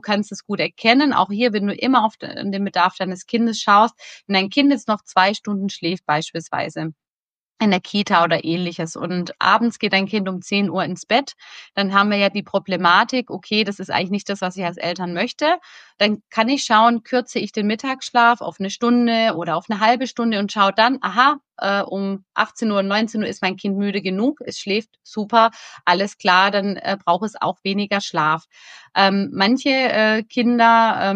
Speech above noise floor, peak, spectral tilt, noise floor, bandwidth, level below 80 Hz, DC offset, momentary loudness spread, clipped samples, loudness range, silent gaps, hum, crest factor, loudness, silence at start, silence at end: over 71 dB; 0 dBFS; -4.5 dB/octave; under -90 dBFS; 9.2 kHz; -70 dBFS; under 0.1%; 9 LU; under 0.1%; 3 LU; 7.20-7.47 s; none; 18 dB; -19 LUFS; 0.05 s; 0 s